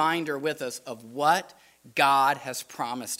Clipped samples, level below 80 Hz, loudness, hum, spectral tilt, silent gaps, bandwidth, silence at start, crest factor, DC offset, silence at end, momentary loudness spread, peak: under 0.1%; -76 dBFS; -26 LUFS; none; -3 dB/octave; none; 16 kHz; 0 s; 22 dB; under 0.1%; 0.05 s; 14 LU; -6 dBFS